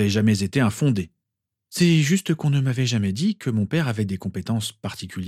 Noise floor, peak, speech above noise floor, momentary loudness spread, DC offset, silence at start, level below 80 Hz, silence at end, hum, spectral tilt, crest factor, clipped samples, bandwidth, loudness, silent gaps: -83 dBFS; -6 dBFS; 62 dB; 10 LU; under 0.1%; 0 s; -58 dBFS; 0 s; none; -6 dB/octave; 16 dB; under 0.1%; 15 kHz; -22 LUFS; none